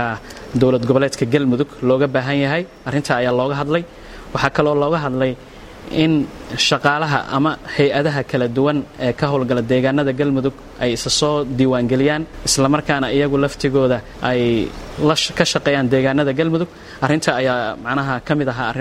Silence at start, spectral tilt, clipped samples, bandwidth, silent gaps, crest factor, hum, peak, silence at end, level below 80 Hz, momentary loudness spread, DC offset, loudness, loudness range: 0 s; -5 dB/octave; under 0.1%; 15 kHz; none; 18 dB; none; 0 dBFS; 0 s; -42 dBFS; 6 LU; under 0.1%; -18 LUFS; 2 LU